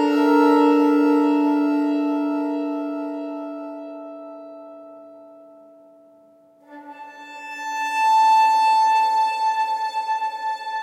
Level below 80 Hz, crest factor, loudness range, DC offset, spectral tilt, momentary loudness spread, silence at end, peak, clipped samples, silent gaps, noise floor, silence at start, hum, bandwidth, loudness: under -90 dBFS; 16 dB; 21 LU; under 0.1%; -3 dB/octave; 22 LU; 0 s; -6 dBFS; under 0.1%; none; -53 dBFS; 0 s; none; 13.5 kHz; -19 LUFS